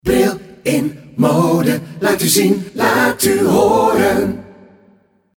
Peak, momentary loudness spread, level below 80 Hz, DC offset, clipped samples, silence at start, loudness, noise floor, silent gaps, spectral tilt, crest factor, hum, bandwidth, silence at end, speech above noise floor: 0 dBFS; 7 LU; -42 dBFS; under 0.1%; under 0.1%; 0.05 s; -15 LUFS; -53 dBFS; none; -4.5 dB/octave; 14 dB; none; 19 kHz; 0.85 s; 39 dB